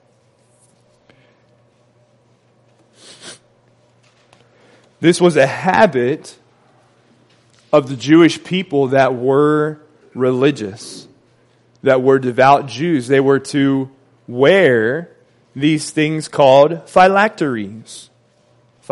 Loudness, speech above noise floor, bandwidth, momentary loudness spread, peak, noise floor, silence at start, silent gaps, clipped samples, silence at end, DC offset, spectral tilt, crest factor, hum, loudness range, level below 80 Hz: -14 LUFS; 42 dB; 11.5 kHz; 22 LU; 0 dBFS; -55 dBFS; 3.25 s; none; under 0.1%; 0.9 s; under 0.1%; -6 dB/octave; 16 dB; none; 3 LU; -60 dBFS